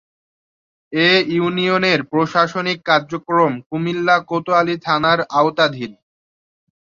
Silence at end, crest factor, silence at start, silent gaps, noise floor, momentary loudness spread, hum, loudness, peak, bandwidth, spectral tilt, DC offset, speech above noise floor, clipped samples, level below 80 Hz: 0.9 s; 18 dB; 0.9 s; 3.66-3.70 s; under -90 dBFS; 6 LU; none; -17 LUFS; -2 dBFS; 7.4 kHz; -5.5 dB/octave; under 0.1%; over 73 dB; under 0.1%; -62 dBFS